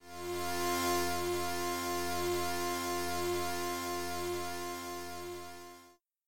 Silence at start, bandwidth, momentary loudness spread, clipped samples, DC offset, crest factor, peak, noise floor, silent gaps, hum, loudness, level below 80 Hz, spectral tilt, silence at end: 0 s; 17 kHz; 11 LU; under 0.1%; under 0.1%; 14 dB; -22 dBFS; -62 dBFS; none; none; -36 LUFS; -64 dBFS; -3 dB/octave; 0.35 s